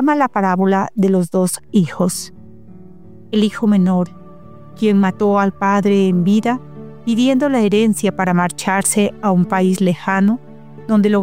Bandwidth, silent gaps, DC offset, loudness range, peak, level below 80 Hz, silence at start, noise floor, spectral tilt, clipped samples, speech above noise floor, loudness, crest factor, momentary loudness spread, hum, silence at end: 16 kHz; none; 0.9%; 3 LU; -2 dBFS; -54 dBFS; 0 s; -40 dBFS; -6 dB/octave; under 0.1%; 26 dB; -16 LUFS; 14 dB; 7 LU; none; 0 s